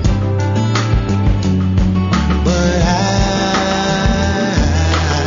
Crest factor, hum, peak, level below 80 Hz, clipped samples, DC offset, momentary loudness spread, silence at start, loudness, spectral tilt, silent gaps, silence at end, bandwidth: 12 dB; none; -2 dBFS; -20 dBFS; under 0.1%; under 0.1%; 2 LU; 0 s; -15 LUFS; -5.5 dB/octave; none; 0 s; 7.6 kHz